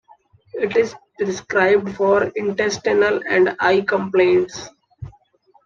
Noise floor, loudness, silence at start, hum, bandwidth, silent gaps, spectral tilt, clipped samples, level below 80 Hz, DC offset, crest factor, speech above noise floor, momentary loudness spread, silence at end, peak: -57 dBFS; -18 LUFS; 0.55 s; none; 7.4 kHz; none; -5 dB/octave; under 0.1%; -56 dBFS; under 0.1%; 16 dB; 40 dB; 20 LU; 0.55 s; -2 dBFS